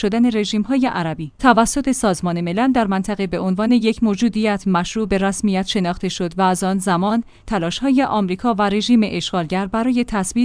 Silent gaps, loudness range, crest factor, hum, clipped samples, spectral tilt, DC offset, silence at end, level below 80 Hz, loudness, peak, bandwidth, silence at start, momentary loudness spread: none; 1 LU; 18 dB; none; under 0.1%; -5 dB/octave; under 0.1%; 0 s; -42 dBFS; -18 LUFS; 0 dBFS; 10.5 kHz; 0 s; 6 LU